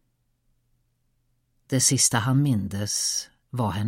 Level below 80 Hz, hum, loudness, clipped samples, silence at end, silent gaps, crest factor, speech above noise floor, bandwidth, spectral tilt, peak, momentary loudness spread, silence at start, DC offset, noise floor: -58 dBFS; none; -23 LUFS; under 0.1%; 0 s; none; 20 dB; 47 dB; 16.5 kHz; -3.5 dB/octave; -8 dBFS; 11 LU; 1.7 s; under 0.1%; -70 dBFS